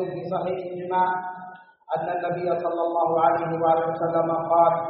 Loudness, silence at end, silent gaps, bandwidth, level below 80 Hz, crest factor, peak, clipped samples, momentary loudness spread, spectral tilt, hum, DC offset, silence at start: -24 LUFS; 0 s; none; 4.6 kHz; -68 dBFS; 18 dB; -6 dBFS; under 0.1%; 10 LU; -5.5 dB/octave; none; under 0.1%; 0 s